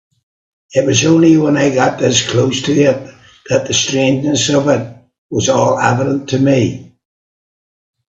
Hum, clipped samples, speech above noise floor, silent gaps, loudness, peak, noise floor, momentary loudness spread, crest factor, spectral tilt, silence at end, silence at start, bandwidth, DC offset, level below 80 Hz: none; under 0.1%; over 78 dB; 5.18-5.29 s; -13 LUFS; 0 dBFS; under -90 dBFS; 8 LU; 14 dB; -4.5 dB/octave; 1.25 s; 0.7 s; 8.2 kHz; under 0.1%; -50 dBFS